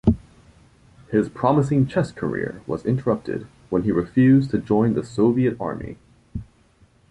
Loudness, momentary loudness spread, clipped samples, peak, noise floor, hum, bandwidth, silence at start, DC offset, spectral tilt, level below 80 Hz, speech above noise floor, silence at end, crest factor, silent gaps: -22 LUFS; 15 LU; under 0.1%; -4 dBFS; -56 dBFS; none; 10.5 kHz; 0.05 s; under 0.1%; -9 dB/octave; -42 dBFS; 36 dB; 0.7 s; 18 dB; none